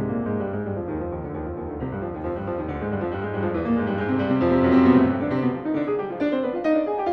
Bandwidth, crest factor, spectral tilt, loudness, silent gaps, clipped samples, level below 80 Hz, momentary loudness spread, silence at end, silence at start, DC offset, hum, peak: 5.2 kHz; 18 dB; -9.5 dB/octave; -24 LUFS; none; under 0.1%; -44 dBFS; 12 LU; 0 s; 0 s; under 0.1%; none; -6 dBFS